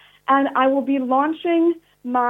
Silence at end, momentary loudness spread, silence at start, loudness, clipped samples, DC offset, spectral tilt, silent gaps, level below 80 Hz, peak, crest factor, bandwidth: 0 s; 4 LU; 0.3 s; -19 LUFS; under 0.1%; under 0.1%; -6 dB/octave; none; -70 dBFS; -4 dBFS; 16 dB; 3.9 kHz